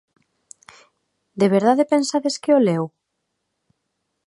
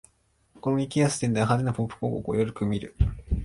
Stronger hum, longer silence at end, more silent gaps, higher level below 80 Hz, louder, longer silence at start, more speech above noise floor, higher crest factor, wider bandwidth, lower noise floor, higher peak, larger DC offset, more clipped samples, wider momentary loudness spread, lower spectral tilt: neither; first, 1.4 s vs 0 s; neither; second, -72 dBFS vs -36 dBFS; first, -19 LUFS vs -27 LUFS; first, 1.35 s vs 0.65 s; first, 58 dB vs 41 dB; about the same, 20 dB vs 16 dB; about the same, 11.5 kHz vs 11.5 kHz; first, -76 dBFS vs -66 dBFS; first, -2 dBFS vs -10 dBFS; neither; neither; first, 10 LU vs 6 LU; about the same, -5.5 dB/octave vs -6.5 dB/octave